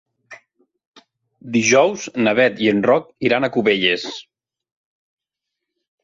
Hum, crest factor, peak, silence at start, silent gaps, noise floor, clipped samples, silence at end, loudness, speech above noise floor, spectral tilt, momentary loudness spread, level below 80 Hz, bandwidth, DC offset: none; 18 dB; -2 dBFS; 0.3 s; 0.87-0.92 s; -82 dBFS; under 0.1%; 1.85 s; -17 LUFS; 65 dB; -4 dB/octave; 8 LU; -62 dBFS; 7.8 kHz; under 0.1%